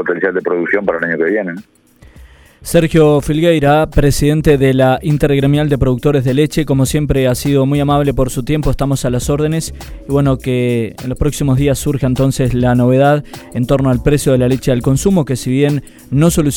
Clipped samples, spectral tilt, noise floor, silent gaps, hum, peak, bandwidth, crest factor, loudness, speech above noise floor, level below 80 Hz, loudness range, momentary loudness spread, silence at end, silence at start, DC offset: under 0.1%; -6.5 dB/octave; -40 dBFS; none; none; 0 dBFS; 17.5 kHz; 12 dB; -13 LUFS; 28 dB; -28 dBFS; 4 LU; 7 LU; 0 s; 0 s; under 0.1%